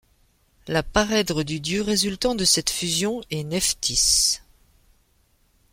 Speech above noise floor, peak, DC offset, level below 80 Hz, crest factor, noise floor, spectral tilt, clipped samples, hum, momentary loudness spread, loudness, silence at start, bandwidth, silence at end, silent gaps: 40 dB; -4 dBFS; under 0.1%; -44 dBFS; 20 dB; -63 dBFS; -2.5 dB/octave; under 0.1%; none; 9 LU; -21 LUFS; 0.65 s; 16.5 kHz; 1.35 s; none